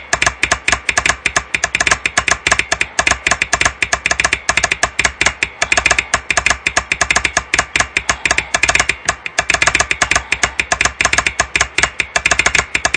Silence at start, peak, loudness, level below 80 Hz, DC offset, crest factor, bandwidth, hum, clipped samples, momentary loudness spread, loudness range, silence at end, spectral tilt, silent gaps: 0 s; 0 dBFS; -14 LUFS; -34 dBFS; under 0.1%; 16 dB; 11 kHz; none; under 0.1%; 3 LU; 0 LU; 0 s; -1 dB/octave; none